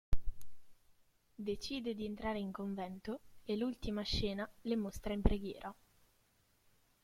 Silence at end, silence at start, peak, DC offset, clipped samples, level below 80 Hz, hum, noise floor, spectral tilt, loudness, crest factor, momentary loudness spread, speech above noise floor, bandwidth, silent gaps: 1.3 s; 0.1 s; -14 dBFS; under 0.1%; under 0.1%; -46 dBFS; none; -74 dBFS; -6 dB/octave; -41 LUFS; 26 dB; 10 LU; 35 dB; 15.5 kHz; none